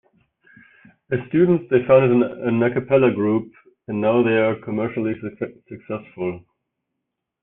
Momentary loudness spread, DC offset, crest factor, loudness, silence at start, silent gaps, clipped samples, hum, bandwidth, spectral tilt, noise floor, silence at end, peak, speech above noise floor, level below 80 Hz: 16 LU; under 0.1%; 18 dB; -20 LUFS; 1.1 s; none; under 0.1%; none; 3.8 kHz; -11.5 dB/octave; -80 dBFS; 1.05 s; -2 dBFS; 61 dB; -60 dBFS